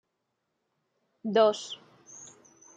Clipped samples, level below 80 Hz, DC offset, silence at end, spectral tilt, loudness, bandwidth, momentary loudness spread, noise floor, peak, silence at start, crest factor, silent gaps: under 0.1%; -86 dBFS; under 0.1%; 0.5 s; -4 dB/octave; -26 LUFS; 9.2 kHz; 23 LU; -81 dBFS; -10 dBFS; 1.25 s; 22 dB; none